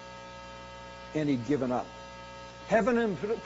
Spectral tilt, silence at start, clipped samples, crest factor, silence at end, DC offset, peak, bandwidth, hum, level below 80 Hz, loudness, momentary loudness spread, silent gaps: -5.5 dB/octave; 0 s; under 0.1%; 20 dB; 0 s; under 0.1%; -12 dBFS; 7.6 kHz; 60 Hz at -55 dBFS; -56 dBFS; -29 LUFS; 18 LU; none